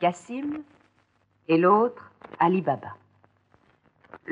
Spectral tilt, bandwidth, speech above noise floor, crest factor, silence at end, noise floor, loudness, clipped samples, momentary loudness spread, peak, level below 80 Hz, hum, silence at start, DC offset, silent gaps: -7.5 dB/octave; 10 kHz; 43 dB; 20 dB; 0 s; -67 dBFS; -24 LUFS; under 0.1%; 25 LU; -8 dBFS; -74 dBFS; none; 0 s; under 0.1%; none